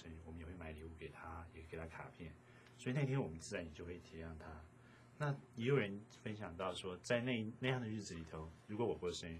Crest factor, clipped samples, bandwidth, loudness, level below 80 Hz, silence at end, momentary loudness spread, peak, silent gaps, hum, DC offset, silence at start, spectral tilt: 22 dB; under 0.1%; 12 kHz; -44 LUFS; -62 dBFS; 0 s; 16 LU; -22 dBFS; none; none; under 0.1%; 0 s; -6 dB/octave